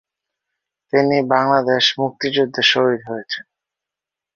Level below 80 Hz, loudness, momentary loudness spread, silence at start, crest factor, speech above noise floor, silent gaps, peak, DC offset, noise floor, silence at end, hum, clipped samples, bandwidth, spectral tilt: -64 dBFS; -17 LUFS; 12 LU; 0.95 s; 18 dB; 70 dB; none; -2 dBFS; under 0.1%; -87 dBFS; 0.95 s; none; under 0.1%; 7.2 kHz; -4.5 dB/octave